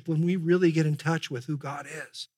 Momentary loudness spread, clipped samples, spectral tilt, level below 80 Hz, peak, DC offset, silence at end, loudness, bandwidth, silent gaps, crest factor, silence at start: 14 LU; under 0.1%; -7 dB/octave; -86 dBFS; -12 dBFS; under 0.1%; 0.1 s; -27 LUFS; 12.5 kHz; none; 16 dB; 0.05 s